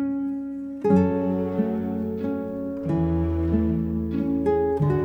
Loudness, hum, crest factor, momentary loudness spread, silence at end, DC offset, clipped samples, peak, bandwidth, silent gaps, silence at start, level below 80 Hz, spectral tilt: -25 LUFS; none; 16 dB; 8 LU; 0 s; under 0.1%; under 0.1%; -8 dBFS; 16.5 kHz; none; 0 s; -38 dBFS; -10.5 dB/octave